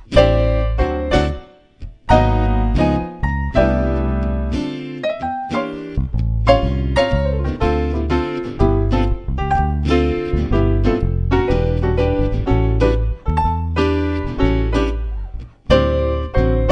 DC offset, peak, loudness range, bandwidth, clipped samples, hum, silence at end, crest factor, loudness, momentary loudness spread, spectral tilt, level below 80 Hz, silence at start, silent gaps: under 0.1%; 0 dBFS; 2 LU; 9.4 kHz; under 0.1%; none; 0 s; 16 dB; -18 LUFS; 8 LU; -8 dB/octave; -22 dBFS; 0 s; none